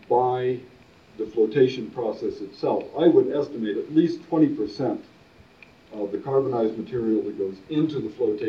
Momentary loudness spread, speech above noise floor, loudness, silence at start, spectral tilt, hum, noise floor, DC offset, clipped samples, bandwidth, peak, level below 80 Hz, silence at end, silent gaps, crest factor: 11 LU; 29 dB; -24 LUFS; 0.1 s; -8.5 dB/octave; none; -53 dBFS; under 0.1%; under 0.1%; 6.8 kHz; -6 dBFS; -64 dBFS; 0 s; none; 18 dB